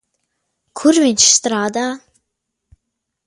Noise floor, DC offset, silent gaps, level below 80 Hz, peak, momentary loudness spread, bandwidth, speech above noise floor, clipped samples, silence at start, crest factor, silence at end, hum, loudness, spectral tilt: -76 dBFS; under 0.1%; none; -58 dBFS; 0 dBFS; 18 LU; 11.5 kHz; 62 dB; under 0.1%; 0.75 s; 18 dB; 1.3 s; none; -13 LUFS; -1.5 dB/octave